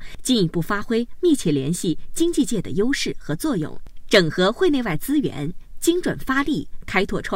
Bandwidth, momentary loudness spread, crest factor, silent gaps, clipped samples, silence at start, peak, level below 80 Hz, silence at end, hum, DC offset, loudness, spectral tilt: 16 kHz; 8 LU; 18 dB; none; under 0.1%; 0 s; -2 dBFS; -38 dBFS; 0 s; none; under 0.1%; -22 LUFS; -4.5 dB/octave